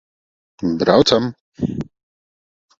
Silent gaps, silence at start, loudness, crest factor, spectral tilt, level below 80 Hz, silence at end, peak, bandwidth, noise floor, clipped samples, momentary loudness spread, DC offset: 1.40-1.52 s; 0.6 s; -18 LUFS; 20 dB; -5.5 dB/octave; -48 dBFS; 0.95 s; 0 dBFS; 8 kHz; under -90 dBFS; under 0.1%; 15 LU; under 0.1%